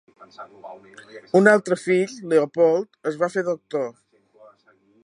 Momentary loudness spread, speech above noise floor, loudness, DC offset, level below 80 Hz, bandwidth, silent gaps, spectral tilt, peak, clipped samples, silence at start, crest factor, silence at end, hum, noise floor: 25 LU; 38 dB; -21 LUFS; under 0.1%; -74 dBFS; 11 kHz; none; -6 dB/octave; -2 dBFS; under 0.1%; 0.4 s; 22 dB; 1.15 s; none; -59 dBFS